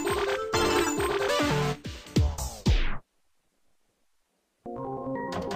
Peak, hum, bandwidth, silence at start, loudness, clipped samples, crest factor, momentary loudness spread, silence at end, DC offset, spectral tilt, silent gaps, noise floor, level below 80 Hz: -12 dBFS; none; 15.5 kHz; 0 s; -28 LUFS; under 0.1%; 18 dB; 13 LU; 0 s; under 0.1%; -4.5 dB/octave; none; -73 dBFS; -36 dBFS